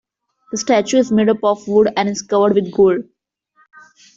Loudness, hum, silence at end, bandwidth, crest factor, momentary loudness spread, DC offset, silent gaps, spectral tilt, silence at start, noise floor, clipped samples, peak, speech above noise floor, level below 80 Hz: -16 LUFS; none; 1.15 s; 7.8 kHz; 14 dB; 7 LU; under 0.1%; none; -5 dB/octave; 0.5 s; -58 dBFS; under 0.1%; -2 dBFS; 43 dB; -56 dBFS